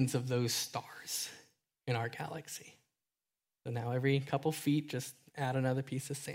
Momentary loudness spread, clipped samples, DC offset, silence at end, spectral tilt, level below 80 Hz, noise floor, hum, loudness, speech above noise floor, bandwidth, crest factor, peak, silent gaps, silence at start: 13 LU; under 0.1%; under 0.1%; 0 s; -5 dB/octave; -76 dBFS; under -90 dBFS; none; -36 LUFS; over 54 dB; 16 kHz; 18 dB; -18 dBFS; none; 0 s